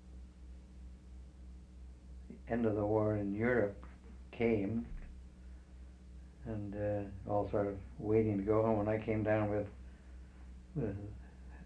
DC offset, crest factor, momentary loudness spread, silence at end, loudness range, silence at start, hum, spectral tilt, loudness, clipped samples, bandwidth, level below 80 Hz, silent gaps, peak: under 0.1%; 18 dB; 22 LU; 0 s; 6 LU; 0 s; none; -9.5 dB/octave; -36 LUFS; under 0.1%; 8.8 kHz; -52 dBFS; none; -18 dBFS